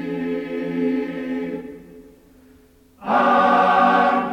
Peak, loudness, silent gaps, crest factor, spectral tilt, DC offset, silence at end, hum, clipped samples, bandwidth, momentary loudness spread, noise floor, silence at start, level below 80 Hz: -6 dBFS; -19 LUFS; none; 14 dB; -6.5 dB/octave; under 0.1%; 0 s; none; under 0.1%; 9.8 kHz; 15 LU; -52 dBFS; 0 s; -56 dBFS